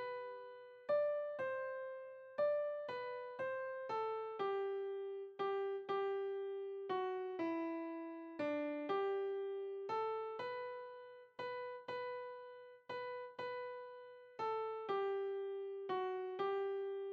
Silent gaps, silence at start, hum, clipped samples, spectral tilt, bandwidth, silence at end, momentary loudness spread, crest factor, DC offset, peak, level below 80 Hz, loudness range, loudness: none; 0 s; none; under 0.1%; -6 dB/octave; 6.4 kHz; 0 s; 11 LU; 14 dB; under 0.1%; -28 dBFS; under -90 dBFS; 5 LU; -43 LUFS